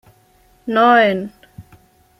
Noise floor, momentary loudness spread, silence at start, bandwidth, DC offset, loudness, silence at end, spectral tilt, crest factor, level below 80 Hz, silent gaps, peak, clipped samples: -54 dBFS; 21 LU; 0.65 s; 14.5 kHz; under 0.1%; -14 LUFS; 0.6 s; -6.5 dB/octave; 16 dB; -58 dBFS; none; -2 dBFS; under 0.1%